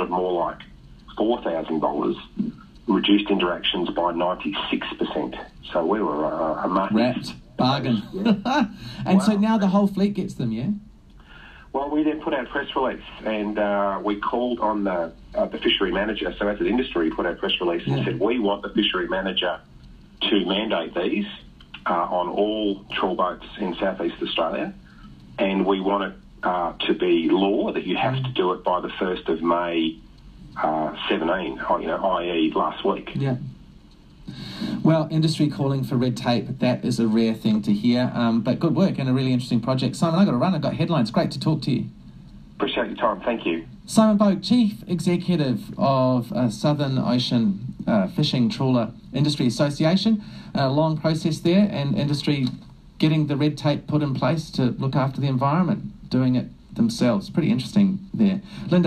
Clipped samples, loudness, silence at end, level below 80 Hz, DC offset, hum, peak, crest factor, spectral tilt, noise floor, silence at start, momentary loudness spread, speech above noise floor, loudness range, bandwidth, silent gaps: under 0.1%; -23 LUFS; 0 s; -50 dBFS; under 0.1%; none; -2 dBFS; 20 dB; -6.5 dB/octave; -48 dBFS; 0 s; 8 LU; 26 dB; 4 LU; 13.5 kHz; none